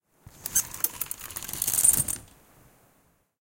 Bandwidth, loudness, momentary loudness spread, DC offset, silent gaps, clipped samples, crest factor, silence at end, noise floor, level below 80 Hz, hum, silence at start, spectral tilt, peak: 17.5 kHz; -25 LUFS; 15 LU; under 0.1%; none; under 0.1%; 26 dB; 1.15 s; -66 dBFS; -54 dBFS; none; 0.4 s; -0.5 dB/octave; -4 dBFS